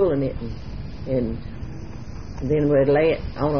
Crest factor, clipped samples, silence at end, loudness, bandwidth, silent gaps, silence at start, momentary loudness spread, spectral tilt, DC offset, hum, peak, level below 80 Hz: 16 dB; under 0.1%; 0 s; -22 LUFS; 6.6 kHz; none; 0 s; 18 LU; -9 dB/octave; 1%; none; -8 dBFS; -36 dBFS